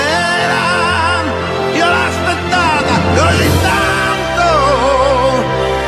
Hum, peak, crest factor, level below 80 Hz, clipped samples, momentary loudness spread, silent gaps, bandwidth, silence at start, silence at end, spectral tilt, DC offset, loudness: none; 0 dBFS; 12 dB; -30 dBFS; under 0.1%; 4 LU; none; 14 kHz; 0 s; 0 s; -4.5 dB/octave; under 0.1%; -12 LUFS